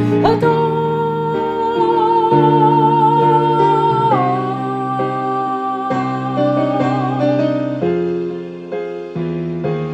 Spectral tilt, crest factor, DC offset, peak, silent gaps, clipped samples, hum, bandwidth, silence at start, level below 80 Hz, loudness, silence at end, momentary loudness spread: -8.5 dB/octave; 14 dB; under 0.1%; 0 dBFS; none; under 0.1%; none; 9.4 kHz; 0 s; -52 dBFS; -16 LUFS; 0 s; 10 LU